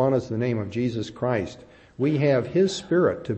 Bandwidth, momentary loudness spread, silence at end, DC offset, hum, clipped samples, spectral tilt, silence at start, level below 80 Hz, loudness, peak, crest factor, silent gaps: 8.6 kHz; 7 LU; 0 s; under 0.1%; none; under 0.1%; -7 dB/octave; 0 s; -58 dBFS; -24 LUFS; -10 dBFS; 14 dB; none